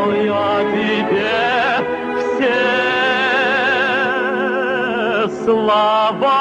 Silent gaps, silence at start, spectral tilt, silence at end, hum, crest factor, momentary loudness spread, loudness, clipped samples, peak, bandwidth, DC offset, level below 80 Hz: none; 0 s; -5 dB/octave; 0 s; none; 12 dB; 3 LU; -16 LUFS; under 0.1%; -4 dBFS; 9.8 kHz; under 0.1%; -54 dBFS